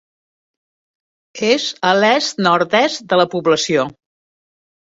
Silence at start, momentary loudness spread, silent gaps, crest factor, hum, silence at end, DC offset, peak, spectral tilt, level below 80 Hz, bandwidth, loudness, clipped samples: 1.35 s; 5 LU; none; 18 dB; none; 0.95 s; under 0.1%; 0 dBFS; -3.5 dB/octave; -62 dBFS; 8 kHz; -16 LUFS; under 0.1%